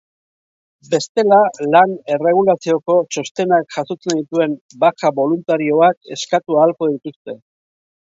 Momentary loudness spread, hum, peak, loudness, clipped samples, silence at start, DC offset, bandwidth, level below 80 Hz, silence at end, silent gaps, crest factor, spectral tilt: 10 LU; none; 0 dBFS; -16 LUFS; under 0.1%; 0.9 s; under 0.1%; 8 kHz; -68 dBFS; 0.75 s; 1.09-1.15 s, 3.31-3.35 s, 4.61-4.69 s, 5.97-6.01 s, 7.16-7.25 s; 16 dB; -5 dB/octave